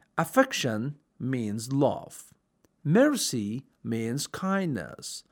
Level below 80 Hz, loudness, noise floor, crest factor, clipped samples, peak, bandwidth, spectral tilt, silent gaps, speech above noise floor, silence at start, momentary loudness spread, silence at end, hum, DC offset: -70 dBFS; -28 LUFS; -69 dBFS; 20 dB; under 0.1%; -8 dBFS; over 20 kHz; -5 dB/octave; none; 41 dB; 0.15 s; 14 LU; 0.1 s; none; under 0.1%